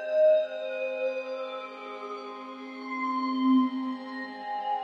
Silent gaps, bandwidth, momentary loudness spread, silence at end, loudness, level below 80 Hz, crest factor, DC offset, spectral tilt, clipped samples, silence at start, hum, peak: none; 6.4 kHz; 16 LU; 0 s; -29 LUFS; under -90 dBFS; 14 dB; under 0.1%; -5.5 dB/octave; under 0.1%; 0 s; none; -14 dBFS